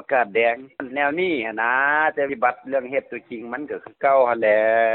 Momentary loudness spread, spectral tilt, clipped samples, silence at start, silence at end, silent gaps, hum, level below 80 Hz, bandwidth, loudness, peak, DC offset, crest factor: 13 LU; -9 dB/octave; under 0.1%; 0.1 s; 0 s; none; none; -68 dBFS; 4.2 kHz; -21 LUFS; -6 dBFS; under 0.1%; 16 dB